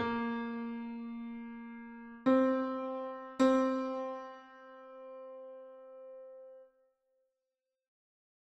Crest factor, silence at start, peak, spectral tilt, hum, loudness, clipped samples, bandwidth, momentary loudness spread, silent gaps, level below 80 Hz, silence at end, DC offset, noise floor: 20 dB; 0 s; -16 dBFS; -6 dB/octave; none; -34 LUFS; under 0.1%; 8.2 kHz; 23 LU; none; -74 dBFS; 1.9 s; under 0.1%; -89 dBFS